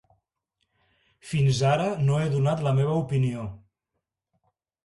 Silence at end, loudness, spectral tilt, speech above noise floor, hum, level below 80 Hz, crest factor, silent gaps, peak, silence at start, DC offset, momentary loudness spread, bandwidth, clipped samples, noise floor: 1.3 s; -25 LUFS; -7 dB/octave; 59 dB; none; -56 dBFS; 14 dB; none; -12 dBFS; 1.25 s; under 0.1%; 8 LU; 11.5 kHz; under 0.1%; -83 dBFS